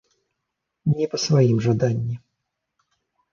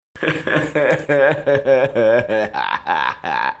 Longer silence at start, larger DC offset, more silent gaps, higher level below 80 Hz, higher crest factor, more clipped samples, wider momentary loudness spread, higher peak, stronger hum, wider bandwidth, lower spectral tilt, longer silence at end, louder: first, 0.85 s vs 0.15 s; neither; neither; about the same, -56 dBFS vs -56 dBFS; about the same, 18 dB vs 16 dB; neither; first, 11 LU vs 6 LU; second, -6 dBFS vs -2 dBFS; neither; second, 7.2 kHz vs 8 kHz; about the same, -6.5 dB/octave vs -6 dB/octave; first, 1.15 s vs 0.05 s; second, -21 LUFS vs -17 LUFS